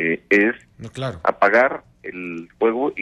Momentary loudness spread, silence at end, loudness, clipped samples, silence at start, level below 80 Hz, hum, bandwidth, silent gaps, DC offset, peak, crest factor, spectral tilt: 17 LU; 0 s; -19 LUFS; under 0.1%; 0 s; -56 dBFS; none; 11 kHz; none; under 0.1%; -4 dBFS; 16 dB; -6.5 dB/octave